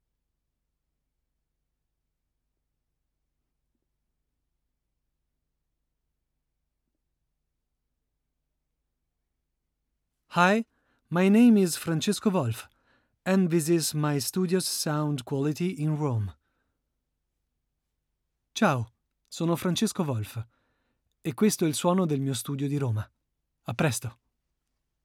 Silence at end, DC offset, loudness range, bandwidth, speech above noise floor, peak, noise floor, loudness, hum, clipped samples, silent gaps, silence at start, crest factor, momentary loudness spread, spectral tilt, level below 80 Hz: 0.9 s; under 0.1%; 8 LU; 17.5 kHz; 56 dB; -8 dBFS; -81 dBFS; -26 LUFS; none; under 0.1%; none; 10.3 s; 22 dB; 15 LU; -5.5 dB/octave; -70 dBFS